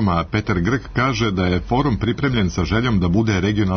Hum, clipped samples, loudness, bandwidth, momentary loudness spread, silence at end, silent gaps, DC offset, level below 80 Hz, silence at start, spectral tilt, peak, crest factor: none; under 0.1%; -19 LUFS; 6.6 kHz; 3 LU; 0 s; none; under 0.1%; -34 dBFS; 0 s; -6.5 dB/octave; -6 dBFS; 12 dB